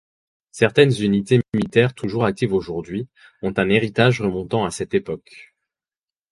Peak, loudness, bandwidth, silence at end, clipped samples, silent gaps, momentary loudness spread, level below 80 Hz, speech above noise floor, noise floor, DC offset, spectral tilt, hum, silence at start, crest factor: 0 dBFS; -20 LUFS; 11.5 kHz; 0.9 s; under 0.1%; none; 13 LU; -50 dBFS; over 70 dB; under -90 dBFS; under 0.1%; -6.5 dB/octave; none; 0.55 s; 20 dB